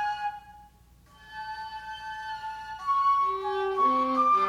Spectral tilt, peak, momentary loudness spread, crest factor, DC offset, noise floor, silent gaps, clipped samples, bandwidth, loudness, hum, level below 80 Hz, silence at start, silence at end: -4.5 dB/octave; -14 dBFS; 15 LU; 14 dB; under 0.1%; -57 dBFS; none; under 0.1%; 11.5 kHz; -28 LUFS; none; -60 dBFS; 0 s; 0 s